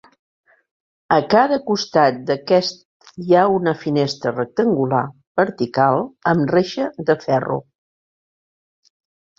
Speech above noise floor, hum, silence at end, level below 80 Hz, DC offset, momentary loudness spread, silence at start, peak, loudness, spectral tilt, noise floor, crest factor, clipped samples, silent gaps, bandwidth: over 72 dB; none; 1.75 s; -60 dBFS; under 0.1%; 8 LU; 1.1 s; -2 dBFS; -18 LUFS; -6 dB/octave; under -90 dBFS; 18 dB; under 0.1%; 2.85-3.00 s, 5.27-5.35 s; 7.6 kHz